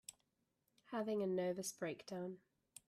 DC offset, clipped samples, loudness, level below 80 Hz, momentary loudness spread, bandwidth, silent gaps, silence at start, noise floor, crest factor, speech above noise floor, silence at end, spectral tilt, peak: under 0.1%; under 0.1%; -44 LUFS; -86 dBFS; 18 LU; 14.5 kHz; none; 0.1 s; -85 dBFS; 14 dB; 42 dB; 0.5 s; -5 dB/octave; -30 dBFS